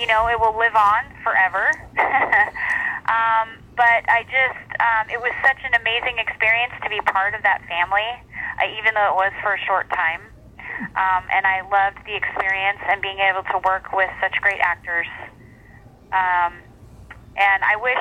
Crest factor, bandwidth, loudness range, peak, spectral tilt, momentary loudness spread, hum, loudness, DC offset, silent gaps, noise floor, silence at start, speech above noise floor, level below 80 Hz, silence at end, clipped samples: 18 dB; 12.5 kHz; 4 LU; -4 dBFS; -3.5 dB/octave; 7 LU; none; -19 LUFS; under 0.1%; none; -46 dBFS; 0 s; 26 dB; -48 dBFS; 0 s; under 0.1%